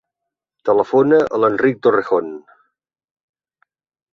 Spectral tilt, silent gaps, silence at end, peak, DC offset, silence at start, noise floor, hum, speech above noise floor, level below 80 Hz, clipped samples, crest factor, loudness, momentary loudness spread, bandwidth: -8 dB/octave; none; 1.75 s; -2 dBFS; under 0.1%; 0.65 s; -82 dBFS; none; 67 dB; -62 dBFS; under 0.1%; 18 dB; -16 LUFS; 12 LU; 6.8 kHz